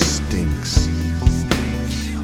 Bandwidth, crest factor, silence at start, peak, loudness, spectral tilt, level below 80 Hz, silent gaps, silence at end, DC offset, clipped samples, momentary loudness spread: 17 kHz; 18 dB; 0 s; 0 dBFS; -20 LUFS; -4.5 dB/octave; -24 dBFS; none; 0 s; under 0.1%; under 0.1%; 4 LU